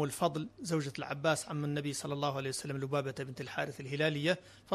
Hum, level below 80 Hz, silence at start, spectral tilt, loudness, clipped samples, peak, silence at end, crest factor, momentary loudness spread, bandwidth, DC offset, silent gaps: none; -70 dBFS; 0 s; -5 dB/octave; -35 LUFS; under 0.1%; -16 dBFS; 0 s; 20 dB; 6 LU; 13.5 kHz; under 0.1%; none